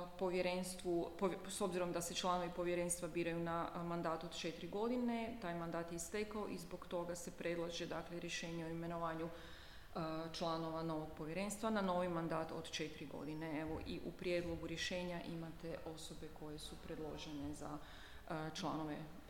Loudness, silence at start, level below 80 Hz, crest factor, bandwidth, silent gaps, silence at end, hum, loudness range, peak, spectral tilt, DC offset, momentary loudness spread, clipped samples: -44 LUFS; 0 s; -62 dBFS; 18 dB; 17.5 kHz; none; 0 s; none; 6 LU; -26 dBFS; -4.5 dB/octave; under 0.1%; 10 LU; under 0.1%